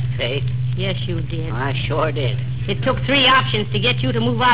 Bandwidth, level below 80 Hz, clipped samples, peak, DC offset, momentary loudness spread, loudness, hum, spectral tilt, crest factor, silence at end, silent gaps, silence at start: 4 kHz; -38 dBFS; under 0.1%; -4 dBFS; 2%; 10 LU; -19 LUFS; none; -9.5 dB/octave; 16 dB; 0 s; none; 0 s